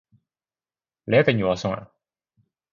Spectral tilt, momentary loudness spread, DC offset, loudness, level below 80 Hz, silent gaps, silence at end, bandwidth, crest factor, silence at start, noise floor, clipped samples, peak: -6.5 dB/octave; 15 LU; under 0.1%; -22 LUFS; -56 dBFS; none; 0.9 s; 7.4 kHz; 22 dB; 1.05 s; under -90 dBFS; under 0.1%; -4 dBFS